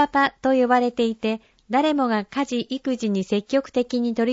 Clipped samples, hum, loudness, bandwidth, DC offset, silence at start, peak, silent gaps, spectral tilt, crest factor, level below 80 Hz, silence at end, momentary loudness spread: under 0.1%; none; -22 LUFS; 8 kHz; under 0.1%; 0 s; -6 dBFS; none; -5.5 dB/octave; 16 dB; -60 dBFS; 0 s; 7 LU